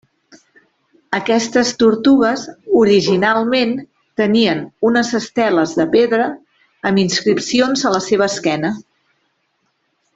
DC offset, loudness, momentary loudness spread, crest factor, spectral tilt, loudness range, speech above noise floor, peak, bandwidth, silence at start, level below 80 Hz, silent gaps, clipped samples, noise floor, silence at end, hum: under 0.1%; -15 LUFS; 10 LU; 14 dB; -4.5 dB/octave; 3 LU; 52 dB; -2 dBFS; 8 kHz; 1.1 s; -56 dBFS; none; under 0.1%; -66 dBFS; 1.35 s; none